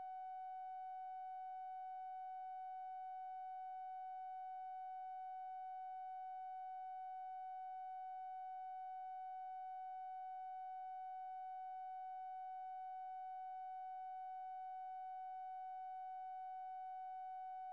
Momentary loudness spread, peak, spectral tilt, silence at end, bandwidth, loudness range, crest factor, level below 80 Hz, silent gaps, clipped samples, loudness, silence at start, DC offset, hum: 0 LU; -46 dBFS; 3 dB/octave; 0 s; 4.7 kHz; 0 LU; 4 dB; under -90 dBFS; none; under 0.1%; -50 LUFS; 0 s; under 0.1%; none